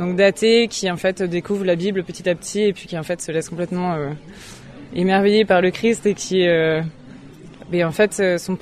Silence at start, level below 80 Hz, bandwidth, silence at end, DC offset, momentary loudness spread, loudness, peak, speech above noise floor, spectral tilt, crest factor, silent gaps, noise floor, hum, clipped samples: 0 s; -52 dBFS; 14.5 kHz; 0.05 s; under 0.1%; 13 LU; -19 LUFS; -2 dBFS; 21 dB; -5 dB/octave; 16 dB; none; -40 dBFS; none; under 0.1%